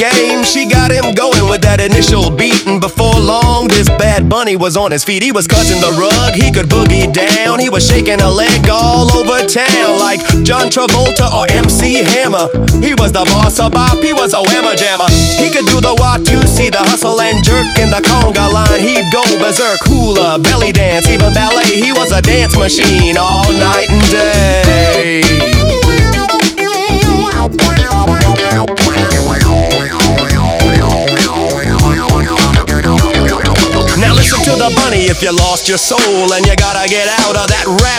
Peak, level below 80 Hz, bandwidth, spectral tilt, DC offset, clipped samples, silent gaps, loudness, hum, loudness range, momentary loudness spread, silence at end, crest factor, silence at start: 0 dBFS; -18 dBFS; 19.5 kHz; -4 dB/octave; under 0.1%; 1%; none; -9 LUFS; none; 2 LU; 3 LU; 0 s; 8 dB; 0 s